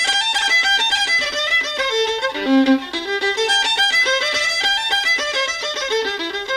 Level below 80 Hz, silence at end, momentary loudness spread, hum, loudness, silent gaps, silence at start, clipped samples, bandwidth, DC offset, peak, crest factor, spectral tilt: -54 dBFS; 0 s; 6 LU; none; -16 LUFS; none; 0 s; under 0.1%; 15.5 kHz; under 0.1%; -4 dBFS; 14 dB; -0.5 dB/octave